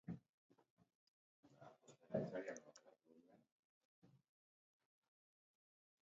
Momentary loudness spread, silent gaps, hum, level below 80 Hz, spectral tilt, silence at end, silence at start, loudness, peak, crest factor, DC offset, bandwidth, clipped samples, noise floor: 21 LU; 0.29-0.50 s, 0.70-0.77 s, 0.95-1.43 s, 3.52-4.02 s; none; -86 dBFS; -7 dB/octave; 2 s; 0.05 s; -50 LUFS; -28 dBFS; 28 dB; under 0.1%; 7.4 kHz; under 0.1%; -72 dBFS